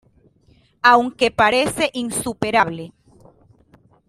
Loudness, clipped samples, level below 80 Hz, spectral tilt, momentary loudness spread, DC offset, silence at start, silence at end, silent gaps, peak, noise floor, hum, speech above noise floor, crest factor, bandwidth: -18 LUFS; under 0.1%; -54 dBFS; -3.5 dB/octave; 10 LU; under 0.1%; 0.85 s; 1.2 s; none; 0 dBFS; -56 dBFS; none; 38 dB; 20 dB; 15.5 kHz